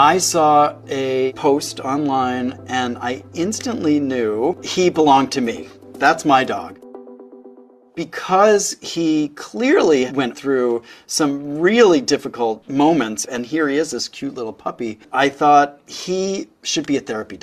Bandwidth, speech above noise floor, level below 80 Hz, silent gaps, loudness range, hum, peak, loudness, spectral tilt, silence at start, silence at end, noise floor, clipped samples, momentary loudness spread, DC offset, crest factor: 14.5 kHz; 27 dB; -60 dBFS; none; 3 LU; none; 0 dBFS; -18 LUFS; -4 dB/octave; 0 s; 0.05 s; -45 dBFS; under 0.1%; 13 LU; under 0.1%; 18 dB